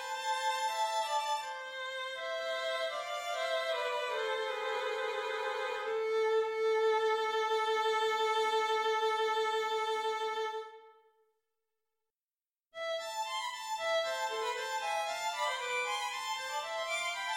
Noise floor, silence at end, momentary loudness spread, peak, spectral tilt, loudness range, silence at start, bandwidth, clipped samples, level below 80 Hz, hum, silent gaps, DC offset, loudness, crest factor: under -90 dBFS; 0 s; 7 LU; -22 dBFS; 1 dB/octave; 8 LU; 0 s; 16.5 kHz; under 0.1%; -82 dBFS; none; none; under 0.1%; -34 LUFS; 14 dB